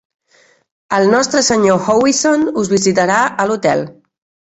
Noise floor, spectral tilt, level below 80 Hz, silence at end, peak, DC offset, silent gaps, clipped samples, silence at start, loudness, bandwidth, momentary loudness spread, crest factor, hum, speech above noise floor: -53 dBFS; -3.5 dB/octave; -52 dBFS; 0.6 s; 0 dBFS; under 0.1%; none; under 0.1%; 0.9 s; -13 LUFS; 8.4 kHz; 5 LU; 14 dB; none; 40 dB